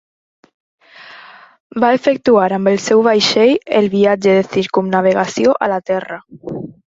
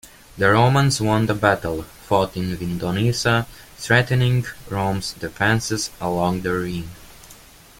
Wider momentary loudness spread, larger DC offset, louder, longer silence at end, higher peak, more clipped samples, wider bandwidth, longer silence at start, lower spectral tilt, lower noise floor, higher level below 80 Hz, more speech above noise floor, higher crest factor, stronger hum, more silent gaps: first, 16 LU vs 12 LU; neither; first, -14 LUFS vs -20 LUFS; second, 0.2 s vs 0.45 s; about the same, -2 dBFS vs -2 dBFS; neither; second, 8 kHz vs 16.5 kHz; first, 1.05 s vs 0.05 s; about the same, -5 dB/octave vs -5 dB/octave; second, -40 dBFS vs -46 dBFS; second, -58 dBFS vs -44 dBFS; about the same, 26 dB vs 26 dB; about the same, 14 dB vs 18 dB; neither; first, 1.60-1.70 s vs none